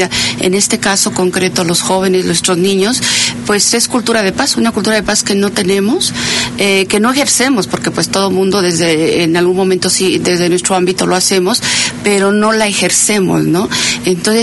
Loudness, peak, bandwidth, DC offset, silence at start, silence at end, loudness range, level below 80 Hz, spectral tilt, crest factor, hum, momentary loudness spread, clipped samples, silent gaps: -11 LUFS; 0 dBFS; 12 kHz; under 0.1%; 0 s; 0 s; 1 LU; -44 dBFS; -3 dB/octave; 12 dB; none; 3 LU; under 0.1%; none